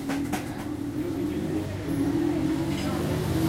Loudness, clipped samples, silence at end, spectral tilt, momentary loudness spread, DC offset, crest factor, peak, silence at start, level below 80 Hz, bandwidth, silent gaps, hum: -28 LUFS; under 0.1%; 0 s; -6.5 dB/octave; 6 LU; under 0.1%; 14 dB; -14 dBFS; 0 s; -46 dBFS; 16 kHz; none; none